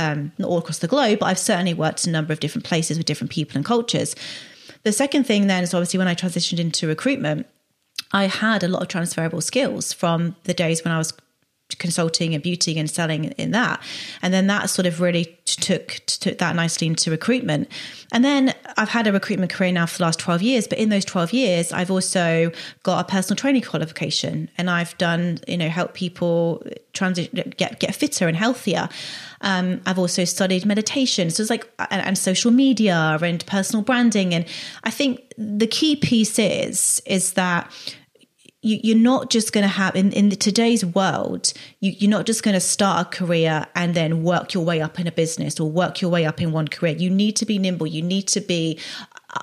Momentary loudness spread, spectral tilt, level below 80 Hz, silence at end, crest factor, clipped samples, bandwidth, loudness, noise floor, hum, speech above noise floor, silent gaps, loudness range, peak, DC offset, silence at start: 7 LU; -4.5 dB/octave; -66 dBFS; 0 s; 18 dB; under 0.1%; 14.5 kHz; -21 LUFS; -54 dBFS; none; 34 dB; none; 4 LU; -4 dBFS; under 0.1%; 0 s